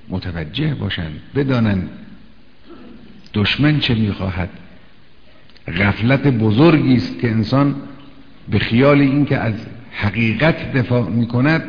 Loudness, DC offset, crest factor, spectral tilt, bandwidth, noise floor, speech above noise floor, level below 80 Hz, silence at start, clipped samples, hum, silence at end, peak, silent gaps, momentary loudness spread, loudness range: -17 LUFS; 1%; 16 dB; -8.5 dB/octave; 5.4 kHz; -49 dBFS; 33 dB; -40 dBFS; 0.1 s; under 0.1%; none; 0 s; 0 dBFS; none; 13 LU; 5 LU